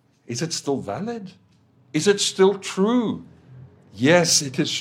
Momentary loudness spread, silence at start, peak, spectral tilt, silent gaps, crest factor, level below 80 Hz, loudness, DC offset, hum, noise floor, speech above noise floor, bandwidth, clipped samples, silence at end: 14 LU; 0.3 s; -2 dBFS; -3.5 dB/octave; none; 20 dB; -68 dBFS; -21 LUFS; under 0.1%; none; -57 dBFS; 36 dB; 16 kHz; under 0.1%; 0 s